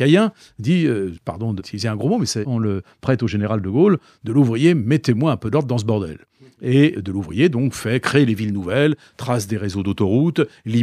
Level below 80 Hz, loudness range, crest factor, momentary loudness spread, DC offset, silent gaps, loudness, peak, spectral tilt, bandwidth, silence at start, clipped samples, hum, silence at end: -52 dBFS; 2 LU; 16 dB; 9 LU; under 0.1%; none; -19 LUFS; -2 dBFS; -6.5 dB/octave; 14.5 kHz; 0 s; under 0.1%; none; 0 s